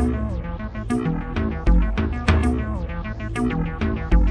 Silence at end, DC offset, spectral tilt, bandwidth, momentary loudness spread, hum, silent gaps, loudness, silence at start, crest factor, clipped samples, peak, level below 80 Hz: 0 s; under 0.1%; -7.5 dB/octave; 10 kHz; 9 LU; none; none; -24 LUFS; 0 s; 16 dB; under 0.1%; -4 dBFS; -24 dBFS